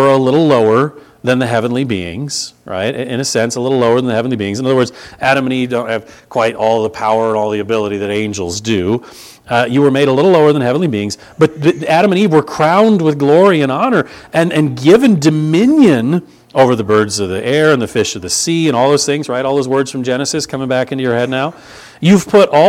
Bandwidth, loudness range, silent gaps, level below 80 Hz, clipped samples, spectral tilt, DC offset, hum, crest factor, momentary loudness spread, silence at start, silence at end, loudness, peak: 16 kHz; 5 LU; none; -50 dBFS; 0.1%; -5.5 dB/octave; under 0.1%; none; 12 dB; 9 LU; 0 s; 0 s; -13 LUFS; 0 dBFS